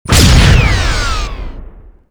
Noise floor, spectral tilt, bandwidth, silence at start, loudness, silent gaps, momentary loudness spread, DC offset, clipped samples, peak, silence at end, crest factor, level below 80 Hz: -33 dBFS; -4 dB/octave; over 20 kHz; 0.05 s; -10 LUFS; none; 20 LU; under 0.1%; 1%; 0 dBFS; 0.45 s; 10 dB; -14 dBFS